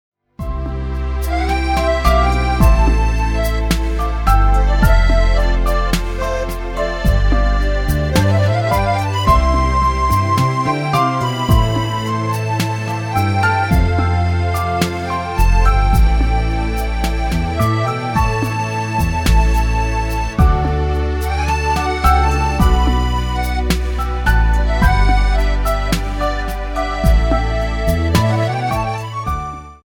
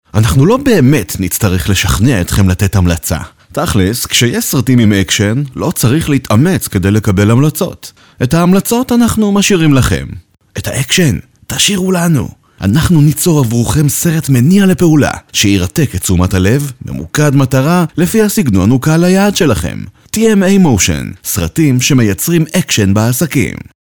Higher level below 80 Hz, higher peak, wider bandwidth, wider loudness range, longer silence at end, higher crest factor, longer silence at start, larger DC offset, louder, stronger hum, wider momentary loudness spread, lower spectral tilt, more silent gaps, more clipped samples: first, -18 dBFS vs -30 dBFS; about the same, 0 dBFS vs 0 dBFS; second, 18 kHz vs over 20 kHz; about the same, 2 LU vs 2 LU; second, 0.1 s vs 0.4 s; about the same, 14 dB vs 10 dB; first, 0.4 s vs 0.15 s; neither; second, -17 LUFS vs -11 LUFS; neither; about the same, 7 LU vs 9 LU; about the same, -6 dB/octave vs -5 dB/octave; neither; neither